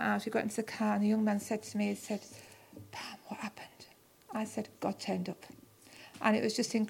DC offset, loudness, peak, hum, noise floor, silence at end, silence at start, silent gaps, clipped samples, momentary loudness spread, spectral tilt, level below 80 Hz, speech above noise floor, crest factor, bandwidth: under 0.1%; -35 LUFS; -12 dBFS; none; -59 dBFS; 0 s; 0 s; none; under 0.1%; 22 LU; -5 dB/octave; -78 dBFS; 25 dB; 22 dB; 16.5 kHz